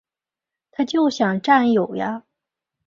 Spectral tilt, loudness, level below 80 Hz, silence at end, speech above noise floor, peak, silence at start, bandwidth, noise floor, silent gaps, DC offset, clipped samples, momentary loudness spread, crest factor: -5.5 dB/octave; -19 LUFS; -66 dBFS; 0.7 s; 70 dB; -2 dBFS; 0.8 s; 7.4 kHz; -89 dBFS; none; under 0.1%; under 0.1%; 14 LU; 20 dB